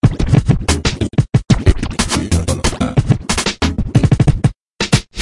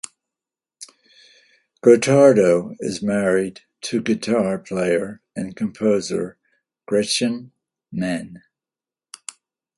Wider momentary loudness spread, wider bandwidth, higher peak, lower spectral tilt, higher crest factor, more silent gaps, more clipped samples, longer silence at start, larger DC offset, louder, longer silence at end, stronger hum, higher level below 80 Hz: second, 5 LU vs 23 LU; about the same, 11.5 kHz vs 11.5 kHz; about the same, 0 dBFS vs 0 dBFS; about the same, -5.5 dB/octave vs -5 dB/octave; second, 14 dB vs 20 dB; first, 4.62-4.66 s vs none; neither; second, 0.05 s vs 0.8 s; neither; first, -15 LUFS vs -20 LUFS; second, 0 s vs 1.4 s; neither; first, -24 dBFS vs -60 dBFS